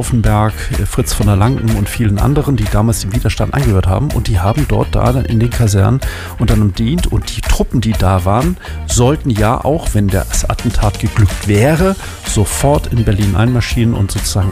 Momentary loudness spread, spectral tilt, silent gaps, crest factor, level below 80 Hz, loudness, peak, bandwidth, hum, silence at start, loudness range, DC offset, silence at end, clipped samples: 5 LU; -6 dB/octave; none; 10 dB; -20 dBFS; -14 LUFS; -2 dBFS; 16 kHz; none; 0 s; 1 LU; under 0.1%; 0 s; under 0.1%